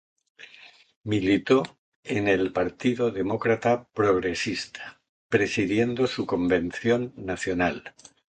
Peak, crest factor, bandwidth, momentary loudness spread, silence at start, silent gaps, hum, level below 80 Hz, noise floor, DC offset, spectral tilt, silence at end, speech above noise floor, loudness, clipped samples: -6 dBFS; 20 dB; 9.2 kHz; 15 LU; 0.4 s; 0.96-1.01 s, 1.79-2.03 s, 5.09-5.29 s; none; -54 dBFS; -52 dBFS; under 0.1%; -5.5 dB/octave; 0.5 s; 27 dB; -25 LUFS; under 0.1%